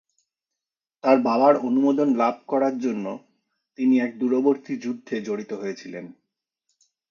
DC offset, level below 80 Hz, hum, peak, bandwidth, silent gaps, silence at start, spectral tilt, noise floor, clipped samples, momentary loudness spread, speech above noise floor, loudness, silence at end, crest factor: under 0.1%; -78 dBFS; none; -4 dBFS; 7 kHz; none; 1.05 s; -6.5 dB/octave; -88 dBFS; under 0.1%; 14 LU; 66 dB; -23 LUFS; 1 s; 20 dB